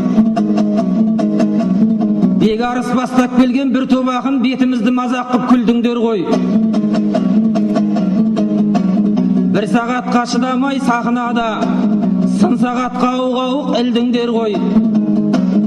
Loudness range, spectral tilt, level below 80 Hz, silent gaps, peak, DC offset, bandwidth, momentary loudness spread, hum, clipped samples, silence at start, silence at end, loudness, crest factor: 1 LU; -7 dB/octave; -48 dBFS; none; -2 dBFS; under 0.1%; 9.6 kHz; 3 LU; none; under 0.1%; 0 s; 0 s; -14 LUFS; 10 dB